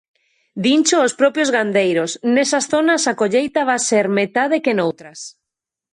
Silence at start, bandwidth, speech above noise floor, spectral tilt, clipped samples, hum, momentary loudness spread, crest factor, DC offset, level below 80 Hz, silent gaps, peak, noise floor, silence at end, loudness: 0.55 s; 11 kHz; 67 dB; -3.5 dB/octave; under 0.1%; none; 8 LU; 16 dB; under 0.1%; -66 dBFS; none; -2 dBFS; -84 dBFS; 0.65 s; -17 LUFS